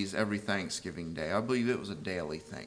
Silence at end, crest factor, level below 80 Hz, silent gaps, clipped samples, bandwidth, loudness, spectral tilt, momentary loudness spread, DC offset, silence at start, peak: 0 s; 18 dB; -62 dBFS; none; under 0.1%; 10.5 kHz; -34 LUFS; -5 dB/octave; 7 LU; under 0.1%; 0 s; -16 dBFS